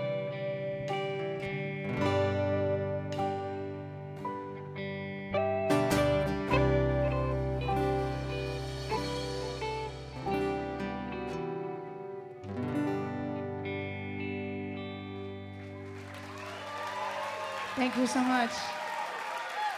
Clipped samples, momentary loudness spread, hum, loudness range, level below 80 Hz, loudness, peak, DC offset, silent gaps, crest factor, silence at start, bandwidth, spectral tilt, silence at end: under 0.1%; 13 LU; none; 9 LU; -48 dBFS; -33 LUFS; -14 dBFS; under 0.1%; none; 20 dB; 0 s; 15.5 kHz; -6 dB/octave; 0 s